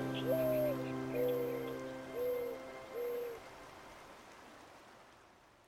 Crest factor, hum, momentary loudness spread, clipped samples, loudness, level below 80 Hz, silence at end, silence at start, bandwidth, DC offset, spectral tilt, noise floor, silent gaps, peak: 16 dB; none; 21 LU; under 0.1%; -39 LUFS; -68 dBFS; 0.2 s; 0 s; over 20 kHz; under 0.1%; -6 dB/octave; -63 dBFS; none; -24 dBFS